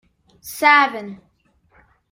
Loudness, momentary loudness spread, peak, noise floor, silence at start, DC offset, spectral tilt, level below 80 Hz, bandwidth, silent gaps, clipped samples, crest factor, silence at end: -15 LUFS; 24 LU; -2 dBFS; -61 dBFS; 0.45 s; under 0.1%; -2.5 dB/octave; -64 dBFS; 16 kHz; none; under 0.1%; 20 dB; 0.95 s